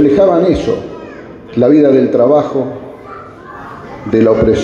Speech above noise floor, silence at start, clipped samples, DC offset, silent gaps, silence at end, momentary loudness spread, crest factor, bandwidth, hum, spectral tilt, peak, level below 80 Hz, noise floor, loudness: 21 dB; 0 s; under 0.1%; under 0.1%; none; 0 s; 22 LU; 12 dB; 7.2 kHz; none; -8 dB/octave; 0 dBFS; -36 dBFS; -31 dBFS; -11 LUFS